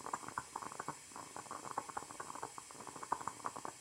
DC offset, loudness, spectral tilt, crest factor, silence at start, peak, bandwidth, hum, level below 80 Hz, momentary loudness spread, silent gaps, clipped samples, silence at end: under 0.1%; -46 LUFS; -2.5 dB/octave; 24 dB; 0 s; -22 dBFS; 16 kHz; none; -76 dBFS; 7 LU; none; under 0.1%; 0 s